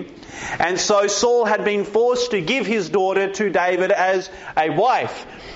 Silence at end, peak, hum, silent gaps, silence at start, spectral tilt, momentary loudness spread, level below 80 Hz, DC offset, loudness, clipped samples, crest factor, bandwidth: 0 s; -6 dBFS; none; none; 0 s; -2.5 dB/octave; 8 LU; -54 dBFS; under 0.1%; -19 LUFS; under 0.1%; 14 dB; 8 kHz